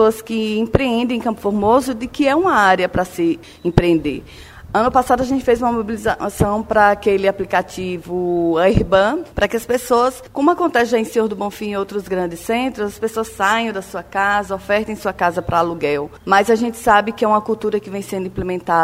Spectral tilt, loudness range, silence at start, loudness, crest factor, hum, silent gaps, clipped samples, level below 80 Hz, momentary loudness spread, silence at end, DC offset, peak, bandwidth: -5.5 dB/octave; 3 LU; 0 s; -18 LUFS; 18 dB; none; none; under 0.1%; -38 dBFS; 9 LU; 0 s; under 0.1%; 0 dBFS; 16 kHz